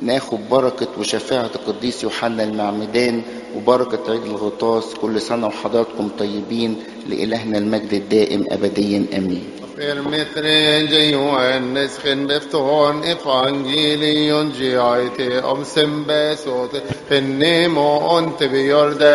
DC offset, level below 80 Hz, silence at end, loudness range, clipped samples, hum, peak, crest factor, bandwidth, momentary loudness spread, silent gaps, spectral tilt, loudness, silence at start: under 0.1%; -56 dBFS; 0 s; 4 LU; under 0.1%; none; 0 dBFS; 18 dB; 11.5 kHz; 8 LU; none; -4.5 dB/octave; -18 LUFS; 0 s